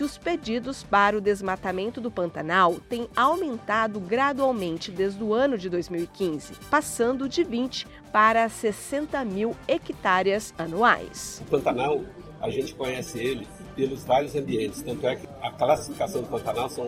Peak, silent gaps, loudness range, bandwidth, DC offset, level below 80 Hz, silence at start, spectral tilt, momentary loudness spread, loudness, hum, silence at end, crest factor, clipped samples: -6 dBFS; none; 3 LU; 16 kHz; under 0.1%; -54 dBFS; 0 s; -4.5 dB/octave; 9 LU; -26 LUFS; none; 0 s; 20 dB; under 0.1%